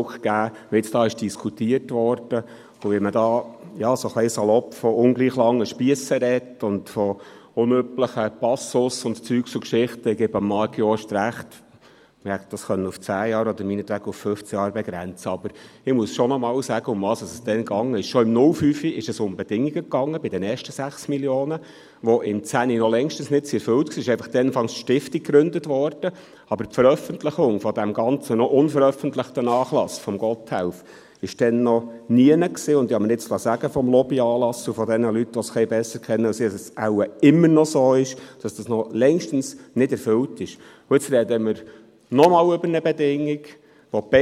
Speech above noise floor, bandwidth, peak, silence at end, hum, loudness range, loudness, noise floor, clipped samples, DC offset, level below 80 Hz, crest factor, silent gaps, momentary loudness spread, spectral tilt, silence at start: 31 dB; 15 kHz; 0 dBFS; 0 s; none; 5 LU; -22 LUFS; -52 dBFS; under 0.1%; under 0.1%; -62 dBFS; 22 dB; none; 10 LU; -6 dB/octave; 0 s